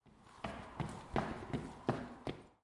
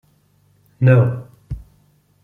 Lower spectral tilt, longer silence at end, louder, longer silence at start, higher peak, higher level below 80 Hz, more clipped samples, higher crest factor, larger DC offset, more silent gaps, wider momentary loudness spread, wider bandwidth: second, -6.5 dB/octave vs -10.5 dB/octave; second, 0.1 s vs 0.65 s; second, -44 LUFS vs -16 LUFS; second, 0.05 s vs 0.8 s; second, -18 dBFS vs -2 dBFS; second, -58 dBFS vs -44 dBFS; neither; first, 26 dB vs 18 dB; neither; neither; second, 7 LU vs 21 LU; first, 11.5 kHz vs 3.8 kHz